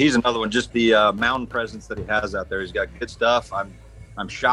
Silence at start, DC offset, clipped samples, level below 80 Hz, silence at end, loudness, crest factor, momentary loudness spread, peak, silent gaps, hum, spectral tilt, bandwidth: 0 s; under 0.1%; under 0.1%; -44 dBFS; 0 s; -22 LUFS; 18 dB; 15 LU; -4 dBFS; none; none; -4.5 dB/octave; 11.5 kHz